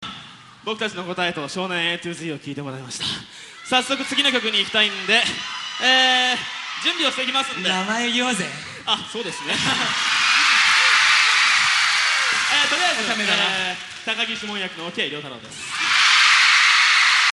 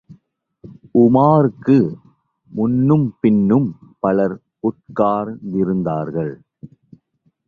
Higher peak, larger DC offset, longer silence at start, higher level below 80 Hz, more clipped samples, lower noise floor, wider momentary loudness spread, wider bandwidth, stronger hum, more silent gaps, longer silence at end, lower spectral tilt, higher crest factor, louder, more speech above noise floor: about the same, -2 dBFS vs -2 dBFS; neither; about the same, 0 s vs 0.1 s; second, -64 dBFS vs -54 dBFS; neither; second, -42 dBFS vs -64 dBFS; first, 16 LU vs 11 LU; first, 12 kHz vs 4.7 kHz; neither; neither; second, 0.05 s vs 0.8 s; second, -1 dB/octave vs -11.5 dB/octave; about the same, 18 dB vs 16 dB; about the same, -18 LUFS vs -17 LUFS; second, 20 dB vs 48 dB